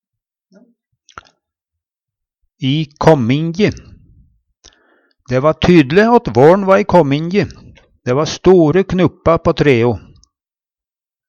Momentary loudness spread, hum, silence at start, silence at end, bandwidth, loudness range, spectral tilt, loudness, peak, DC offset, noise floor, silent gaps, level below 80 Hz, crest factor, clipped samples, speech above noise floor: 9 LU; none; 2.6 s; 1.3 s; 7.8 kHz; 6 LU; -7 dB/octave; -13 LUFS; 0 dBFS; under 0.1%; under -90 dBFS; none; -40 dBFS; 14 dB; under 0.1%; over 78 dB